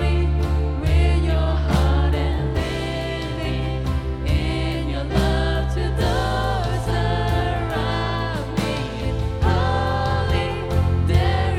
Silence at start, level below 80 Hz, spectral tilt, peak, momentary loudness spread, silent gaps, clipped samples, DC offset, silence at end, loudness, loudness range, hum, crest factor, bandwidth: 0 s; -24 dBFS; -6.5 dB/octave; -4 dBFS; 6 LU; none; under 0.1%; under 0.1%; 0 s; -22 LUFS; 2 LU; none; 16 dB; 13 kHz